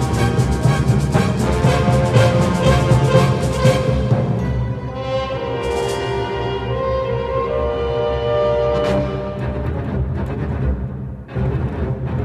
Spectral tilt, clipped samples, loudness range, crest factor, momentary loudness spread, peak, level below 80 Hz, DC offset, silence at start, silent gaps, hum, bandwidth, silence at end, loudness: -7 dB/octave; under 0.1%; 6 LU; 16 dB; 9 LU; -2 dBFS; -28 dBFS; under 0.1%; 0 s; none; none; 13 kHz; 0 s; -18 LUFS